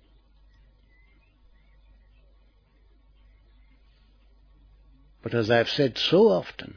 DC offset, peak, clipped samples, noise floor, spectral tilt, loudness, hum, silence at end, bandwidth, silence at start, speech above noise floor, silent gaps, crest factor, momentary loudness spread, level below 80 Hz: under 0.1%; -6 dBFS; under 0.1%; -59 dBFS; -6 dB/octave; -23 LUFS; none; 0.1 s; 5.4 kHz; 5.25 s; 37 dB; none; 22 dB; 10 LU; -58 dBFS